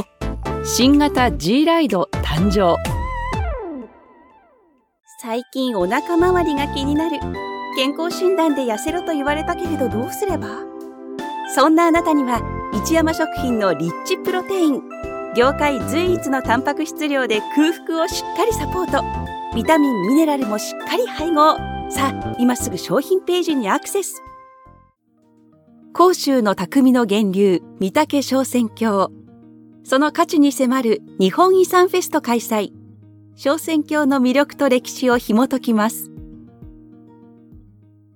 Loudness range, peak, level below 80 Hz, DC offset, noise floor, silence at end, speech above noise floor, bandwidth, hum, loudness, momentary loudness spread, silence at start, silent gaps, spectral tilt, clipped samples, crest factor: 4 LU; -2 dBFS; -38 dBFS; under 0.1%; -58 dBFS; 0.55 s; 40 dB; 18 kHz; none; -18 LUFS; 11 LU; 0 s; none; -5 dB/octave; under 0.1%; 18 dB